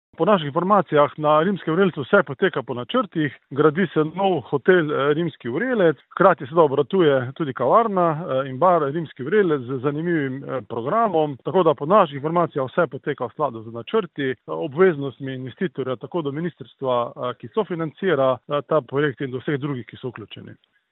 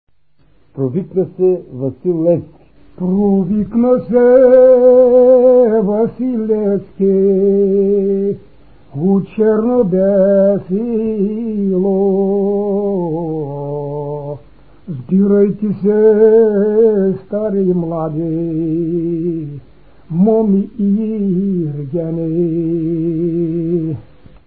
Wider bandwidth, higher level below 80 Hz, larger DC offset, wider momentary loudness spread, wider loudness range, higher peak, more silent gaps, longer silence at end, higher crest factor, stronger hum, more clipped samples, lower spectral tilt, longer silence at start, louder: first, 4.1 kHz vs 3.3 kHz; second, -68 dBFS vs -48 dBFS; second, under 0.1% vs 0.7%; about the same, 11 LU vs 13 LU; second, 5 LU vs 8 LU; about the same, 0 dBFS vs 0 dBFS; neither; about the same, 0.4 s vs 0.45 s; first, 20 dB vs 14 dB; neither; neither; second, -11 dB/octave vs -15 dB/octave; second, 0.2 s vs 0.75 s; second, -21 LUFS vs -14 LUFS